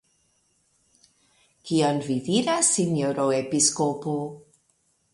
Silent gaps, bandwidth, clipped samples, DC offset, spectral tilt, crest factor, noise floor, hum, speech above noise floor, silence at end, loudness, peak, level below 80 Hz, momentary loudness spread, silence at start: none; 11.5 kHz; under 0.1%; under 0.1%; -4 dB/octave; 20 dB; -69 dBFS; none; 45 dB; 0.75 s; -23 LUFS; -6 dBFS; -68 dBFS; 10 LU; 1.65 s